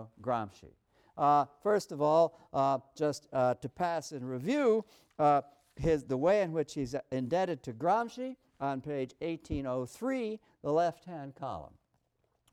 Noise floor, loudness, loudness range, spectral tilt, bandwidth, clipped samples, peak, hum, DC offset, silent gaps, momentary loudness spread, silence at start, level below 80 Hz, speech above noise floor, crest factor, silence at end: -77 dBFS; -32 LUFS; 5 LU; -6.5 dB/octave; 14 kHz; under 0.1%; -16 dBFS; none; under 0.1%; none; 13 LU; 0 s; -58 dBFS; 45 dB; 16 dB; 0.85 s